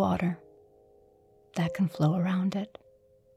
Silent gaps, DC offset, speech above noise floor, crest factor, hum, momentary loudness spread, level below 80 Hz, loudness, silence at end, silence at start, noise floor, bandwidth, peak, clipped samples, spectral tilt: none; under 0.1%; 33 dB; 16 dB; none; 13 LU; -62 dBFS; -29 LUFS; 0.7 s; 0 s; -61 dBFS; 13 kHz; -14 dBFS; under 0.1%; -8 dB/octave